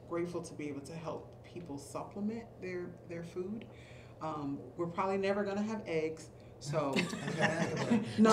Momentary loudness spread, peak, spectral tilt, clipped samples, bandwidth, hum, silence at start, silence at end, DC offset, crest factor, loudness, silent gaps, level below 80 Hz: 14 LU; -14 dBFS; -5.5 dB/octave; under 0.1%; 13.5 kHz; none; 0 s; 0 s; under 0.1%; 22 dB; -37 LUFS; none; -66 dBFS